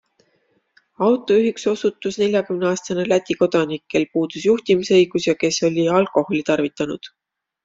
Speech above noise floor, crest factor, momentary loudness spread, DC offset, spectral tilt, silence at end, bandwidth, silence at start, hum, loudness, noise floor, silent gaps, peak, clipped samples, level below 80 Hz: 46 dB; 16 dB; 6 LU; under 0.1%; -5 dB/octave; 0.6 s; 7.8 kHz; 1 s; none; -19 LUFS; -65 dBFS; none; -4 dBFS; under 0.1%; -62 dBFS